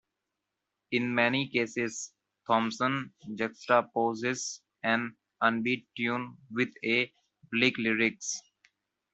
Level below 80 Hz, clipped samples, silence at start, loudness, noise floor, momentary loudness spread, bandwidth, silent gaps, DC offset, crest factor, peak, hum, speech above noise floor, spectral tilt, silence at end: -74 dBFS; under 0.1%; 0.9 s; -30 LUFS; -86 dBFS; 10 LU; 8.2 kHz; none; under 0.1%; 22 dB; -8 dBFS; none; 56 dB; -3.5 dB/octave; 0.75 s